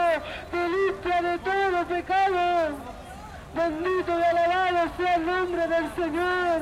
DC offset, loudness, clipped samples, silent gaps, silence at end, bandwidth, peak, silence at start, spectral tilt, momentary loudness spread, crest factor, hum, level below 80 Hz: under 0.1%; -25 LUFS; under 0.1%; none; 0 s; 13.5 kHz; -14 dBFS; 0 s; -5 dB/octave; 9 LU; 12 dB; none; -50 dBFS